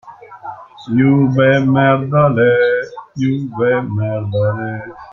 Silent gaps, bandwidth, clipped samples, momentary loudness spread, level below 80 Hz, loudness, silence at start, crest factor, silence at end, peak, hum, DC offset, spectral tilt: none; 6.6 kHz; under 0.1%; 18 LU; -50 dBFS; -15 LUFS; 0.05 s; 14 dB; 0 s; -2 dBFS; none; under 0.1%; -9 dB/octave